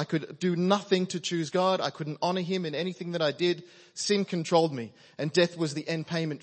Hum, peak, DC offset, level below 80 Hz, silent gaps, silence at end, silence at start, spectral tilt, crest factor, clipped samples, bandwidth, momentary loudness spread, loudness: none; -10 dBFS; under 0.1%; -78 dBFS; none; 0.05 s; 0 s; -5 dB/octave; 20 dB; under 0.1%; 8.8 kHz; 7 LU; -28 LUFS